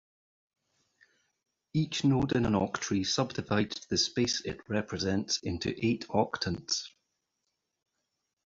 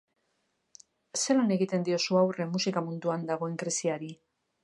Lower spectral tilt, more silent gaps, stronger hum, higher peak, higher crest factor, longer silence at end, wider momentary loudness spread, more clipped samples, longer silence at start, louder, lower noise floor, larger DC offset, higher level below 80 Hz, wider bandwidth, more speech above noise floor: about the same, -4.5 dB/octave vs -4.5 dB/octave; neither; neither; about the same, -12 dBFS vs -14 dBFS; about the same, 20 dB vs 16 dB; first, 1.55 s vs 0.5 s; about the same, 6 LU vs 8 LU; neither; first, 1.75 s vs 1.15 s; about the same, -31 LUFS vs -29 LUFS; first, -83 dBFS vs -77 dBFS; neither; first, -56 dBFS vs -80 dBFS; second, 7.8 kHz vs 11.5 kHz; first, 52 dB vs 48 dB